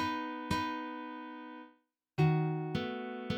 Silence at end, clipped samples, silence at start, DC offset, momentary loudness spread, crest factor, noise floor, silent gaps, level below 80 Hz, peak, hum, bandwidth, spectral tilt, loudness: 0 s; under 0.1%; 0 s; under 0.1%; 16 LU; 18 dB; -69 dBFS; none; -62 dBFS; -18 dBFS; none; 11.5 kHz; -7 dB/octave; -35 LUFS